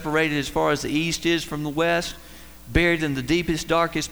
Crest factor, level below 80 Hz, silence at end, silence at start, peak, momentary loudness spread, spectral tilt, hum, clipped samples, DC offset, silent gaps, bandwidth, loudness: 16 dB; -40 dBFS; 0 s; 0 s; -6 dBFS; 6 LU; -4.5 dB/octave; none; under 0.1%; 0.4%; none; over 20 kHz; -23 LUFS